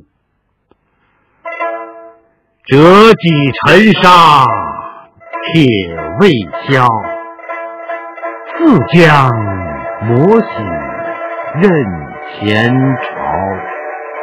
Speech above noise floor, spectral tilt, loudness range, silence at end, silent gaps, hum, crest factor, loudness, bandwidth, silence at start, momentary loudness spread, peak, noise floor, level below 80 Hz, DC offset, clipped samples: 55 dB; -6.5 dB/octave; 7 LU; 0 s; none; none; 12 dB; -10 LUFS; 17 kHz; 1.45 s; 19 LU; 0 dBFS; -62 dBFS; -42 dBFS; under 0.1%; 3%